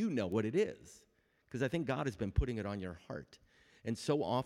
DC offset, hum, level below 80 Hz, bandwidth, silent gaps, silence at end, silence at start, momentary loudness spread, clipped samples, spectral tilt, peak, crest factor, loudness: under 0.1%; none; -48 dBFS; 13.5 kHz; none; 0 s; 0 s; 14 LU; under 0.1%; -6.5 dB/octave; -18 dBFS; 18 dB; -38 LUFS